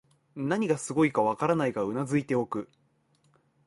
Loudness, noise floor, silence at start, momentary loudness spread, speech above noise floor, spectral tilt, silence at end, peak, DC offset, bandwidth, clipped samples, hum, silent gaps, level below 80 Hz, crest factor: -28 LUFS; -68 dBFS; 0.35 s; 11 LU; 41 dB; -6.5 dB/octave; 1 s; -12 dBFS; under 0.1%; 11.5 kHz; under 0.1%; none; none; -68 dBFS; 18 dB